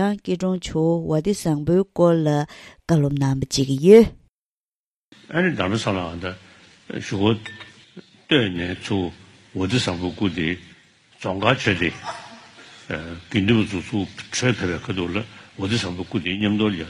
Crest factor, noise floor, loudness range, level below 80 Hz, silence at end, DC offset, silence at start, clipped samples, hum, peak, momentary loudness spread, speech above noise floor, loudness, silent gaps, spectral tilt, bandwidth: 22 dB; under -90 dBFS; 7 LU; -50 dBFS; 0 s; under 0.1%; 0 s; under 0.1%; none; 0 dBFS; 14 LU; over 69 dB; -22 LUFS; 4.30-5.12 s; -5.5 dB/octave; 13.5 kHz